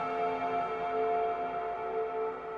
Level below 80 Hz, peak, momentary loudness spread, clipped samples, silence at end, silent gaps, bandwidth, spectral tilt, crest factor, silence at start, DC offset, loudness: -66 dBFS; -22 dBFS; 4 LU; under 0.1%; 0 s; none; 6.8 kHz; -6.5 dB/octave; 12 dB; 0 s; under 0.1%; -33 LUFS